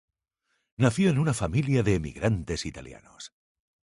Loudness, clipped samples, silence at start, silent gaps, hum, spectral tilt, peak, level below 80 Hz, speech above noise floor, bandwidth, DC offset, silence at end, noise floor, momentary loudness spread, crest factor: -26 LUFS; under 0.1%; 0.8 s; none; none; -6.5 dB/octave; -8 dBFS; -46 dBFS; 51 dB; 11.5 kHz; under 0.1%; 0.7 s; -77 dBFS; 21 LU; 20 dB